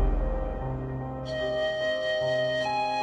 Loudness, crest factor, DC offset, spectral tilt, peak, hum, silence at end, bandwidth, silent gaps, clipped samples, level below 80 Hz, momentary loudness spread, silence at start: -29 LUFS; 12 dB; under 0.1%; -5.5 dB/octave; -14 dBFS; none; 0 s; 8.6 kHz; none; under 0.1%; -34 dBFS; 7 LU; 0 s